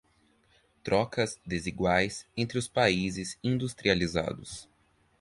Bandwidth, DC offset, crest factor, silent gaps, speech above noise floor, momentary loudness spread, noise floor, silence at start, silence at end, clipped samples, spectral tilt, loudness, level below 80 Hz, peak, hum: 11.5 kHz; under 0.1%; 24 dB; none; 37 dB; 10 LU; -67 dBFS; 0.85 s; 0.6 s; under 0.1%; -5 dB/octave; -29 LUFS; -52 dBFS; -6 dBFS; none